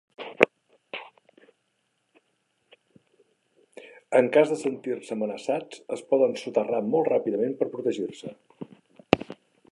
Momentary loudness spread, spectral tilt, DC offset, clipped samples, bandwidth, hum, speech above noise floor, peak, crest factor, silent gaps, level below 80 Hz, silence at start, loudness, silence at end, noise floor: 22 LU; -5.5 dB/octave; under 0.1%; under 0.1%; 11.5 kHz; none; 49 dB; 0 dBFS; 28 dB; none; -66 dBFS; 0.2 s; -26 LUFS; 0.4 s; -74 dBFS